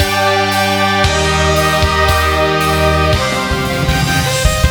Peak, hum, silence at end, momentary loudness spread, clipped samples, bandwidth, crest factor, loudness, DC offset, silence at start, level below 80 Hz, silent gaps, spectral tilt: 0 dBFS; none; 0 s; 3 LU; under 0.1%; over 20 kHz; 12 dB; -12 LUFS; under 0.1%; 0 s; -22 dBFS; none; -4 dB/octave